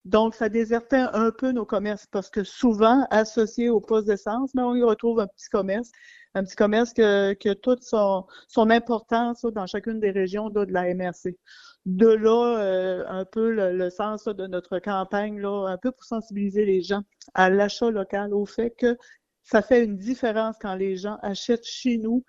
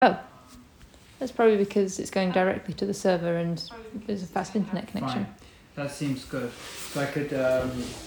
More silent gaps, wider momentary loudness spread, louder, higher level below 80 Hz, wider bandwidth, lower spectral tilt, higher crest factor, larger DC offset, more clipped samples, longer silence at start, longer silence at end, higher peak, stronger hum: neither; second, 10 LU vs 13 LU; first, -24 LUFS vs -28 LUFS; about the same, -56 dBFS vs -56 dBFS; second, 7.6 kHz vs over 20 kHz; about the same, -6 dB/octave vs -5.5 dB/octave; about the same, 20 dB vs 22 dB; neither; neither; about the same, 0.05 s vs 0 s; about the same, 0.05 s vs 0 s; about the same, -4 dBFS vs -6 dBFS; neither